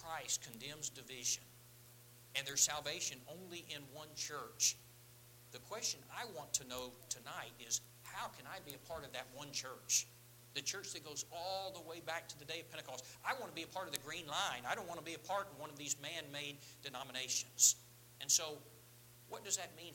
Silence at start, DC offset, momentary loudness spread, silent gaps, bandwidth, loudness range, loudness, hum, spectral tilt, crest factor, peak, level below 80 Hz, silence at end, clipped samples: 0 s; under 0.1%; 18 LU; none; 17 kHz; 8 LU; -40 LUFS; none; -0.5 dB/octave; 30 dB; -14 dBFS; -76 dBFS; 0 s; under 0.1%